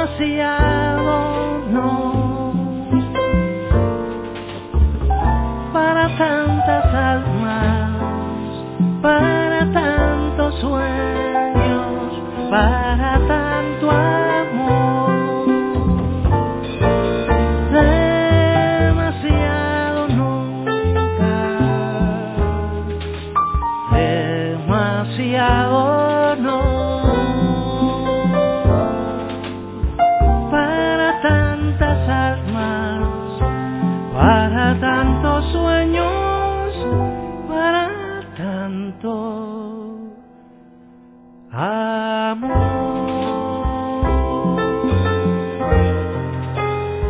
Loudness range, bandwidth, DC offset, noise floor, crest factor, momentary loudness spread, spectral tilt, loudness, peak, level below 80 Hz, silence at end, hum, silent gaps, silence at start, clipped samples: 5 LU; 4 kHz; under 0.1%; -44 dBFS; 18 dB; 9 LU; -11 dB/octave; -18 LUFS; 0 dBFS; -26 dBFS; 0 s; none; none; 0 s; under 0.1%